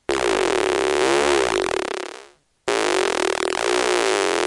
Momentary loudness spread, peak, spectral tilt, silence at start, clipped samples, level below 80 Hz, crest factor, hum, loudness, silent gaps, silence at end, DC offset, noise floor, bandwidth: 8 LU; -2 dBFS; -2 dB/octave; 0.1 s; under 0.1%; -50 dBFS; 18 dB; none; -20 LUFS; none; 0 s; under 0.1%; -47 dBFS; 11.5 kHz